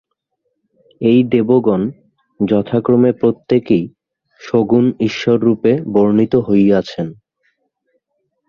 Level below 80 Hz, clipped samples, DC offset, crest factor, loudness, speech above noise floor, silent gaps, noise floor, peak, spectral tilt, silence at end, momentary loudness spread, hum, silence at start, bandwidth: -52 dBFS; under 0.1%; under 0.1%; 14 dB; -15 LUFS; 57 dB; none; -71 dBFS; 0 dBFS; -8.5 dB/octave; 1.35 s; 7 LU; none; 1 s; 6.8 kHz